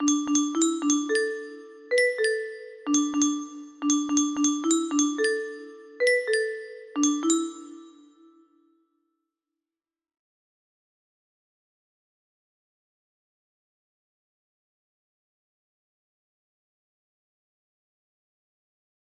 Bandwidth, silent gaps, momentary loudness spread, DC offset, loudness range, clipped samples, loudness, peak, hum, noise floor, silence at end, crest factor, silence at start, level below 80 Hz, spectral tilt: 11.5 kHz; none; 15 LU; under 0.1%; 6 LU; under 0.1%; -25 LUFS; -10 dBFS; none; under -90 dBFS; 11.1 s; 18 dB; 0 s; -76 dBFS; -0.5 dB/octave